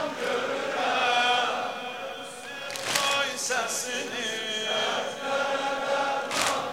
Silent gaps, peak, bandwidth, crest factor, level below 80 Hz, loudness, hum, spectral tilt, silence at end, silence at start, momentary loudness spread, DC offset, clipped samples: none; -8 dBFS; 16 kHz; 20 dB; -70 dBFS; -27 LUFS; none; -1 dB/octave; 0 s; 0 s; 11 LU; 0.1%; under 0.1%